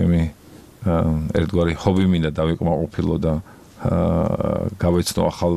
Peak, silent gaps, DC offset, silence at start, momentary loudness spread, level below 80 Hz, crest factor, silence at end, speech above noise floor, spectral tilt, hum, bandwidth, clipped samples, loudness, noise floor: -2 dBFS; none; 0.2%; 0 s; 5 LU; -34 dBFS; 18 dB; 0 s; 25 dB; -7 dB/octave; none; 14 kHz; under 0.1%; -21 LUFS; -45 dBFS